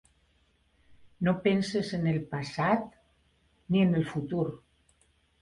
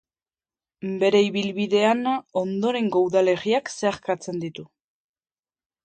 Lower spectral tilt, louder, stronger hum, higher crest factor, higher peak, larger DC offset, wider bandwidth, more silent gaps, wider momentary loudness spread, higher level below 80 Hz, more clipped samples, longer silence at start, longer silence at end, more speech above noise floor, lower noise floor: first, -7 dB/octave vs -5 dB/octave; second, -29 LUFS vs -23 LUFS; neither; about the same, 18 dB vs 18 dB; second, -12 dBFS vs -6 dBFS; neither; first, 11 kHz vs 9.2 kHz; neither; second, 9 LU vs 12 LU; first, -62 dBFS vs -68 dBFS; neither; about the same, 0.9 s vs 0.8 s; second, 0.85 s vs 1.2 s; second, 41 dB vs over 68 dB; second, -69 dBFS vs under -90 dBFS